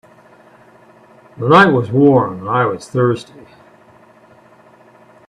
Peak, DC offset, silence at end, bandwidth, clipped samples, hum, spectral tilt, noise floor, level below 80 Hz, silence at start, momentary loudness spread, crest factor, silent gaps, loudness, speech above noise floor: 0 dBFS; under 0.1%; 2.05 s; 11 kHz; under 0.1%; none; -7.5 dB/octave; -46 dBFS; -56 dBFS; 1.4 s; 9 LU; 18 dB; none; -14 LUFS; 33 dB